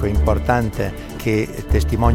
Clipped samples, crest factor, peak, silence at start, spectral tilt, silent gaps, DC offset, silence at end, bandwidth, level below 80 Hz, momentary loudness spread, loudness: under 0.1%; 16 dB; -2 dBFS; 0 s; -7 dB/octave; none; under 0.1%; 0 s; 16 kHz; -22 dBFS; 8 LU; -20 LUFS